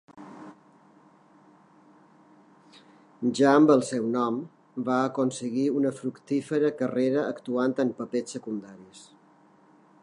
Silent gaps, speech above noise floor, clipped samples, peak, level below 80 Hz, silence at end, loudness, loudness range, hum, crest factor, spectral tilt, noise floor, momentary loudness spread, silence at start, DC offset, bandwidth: none; 33 dB; under 0.1%; -6 dBFS; -80 dBFS; 1 s; -26 LUFS; 5 LU; none; 22 dB; -6 dB/octave; -58 dBFS; 19 LU; 0.15 s; under 0.1%; 11 kHz